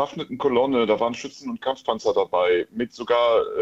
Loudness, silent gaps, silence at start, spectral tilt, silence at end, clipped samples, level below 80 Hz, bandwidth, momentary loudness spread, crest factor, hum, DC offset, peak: -23 LUFS; none; 0 s; -5 dB/octave; 0 s; under 0.1%; -60 dBFS; 7.8 kHz; 10 LU; 16 dB; none; under 0.1%; -6 dBFS